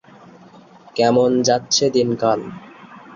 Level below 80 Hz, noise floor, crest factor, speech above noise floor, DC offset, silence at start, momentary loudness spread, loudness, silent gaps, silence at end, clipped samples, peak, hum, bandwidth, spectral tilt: -60 dBFS; -45 dBFS; 16 dB; 28 dB; under 0.1%; 0.95 s; 15 LU; -17 LUFS; none; 0 s; under 0.1%; -4 dBFS; none; 7.4 kHz; -4 dB/octave